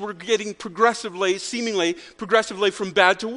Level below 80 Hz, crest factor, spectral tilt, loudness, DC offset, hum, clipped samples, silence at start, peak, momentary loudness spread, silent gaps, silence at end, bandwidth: -64 dBFS; 22 dB; -3 dB/octave; -22 LUFS; under 0.1%; none; under 0.1%; 0 s; 0 dBFS; 7 LU; none; 0 s; 10.5 kHz